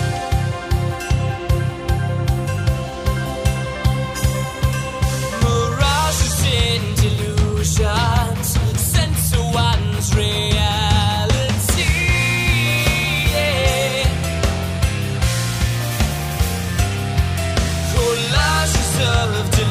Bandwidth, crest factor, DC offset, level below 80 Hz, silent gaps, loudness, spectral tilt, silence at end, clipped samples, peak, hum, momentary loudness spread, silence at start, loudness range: 16 kHz; 14 dB; under 0.1%; -24 dBFS; none; -18 LUFS; -4.5 dB/octave; 0 s; under 0.1%; -4 dBFS; none; 5 LU; 0 s; 4 LU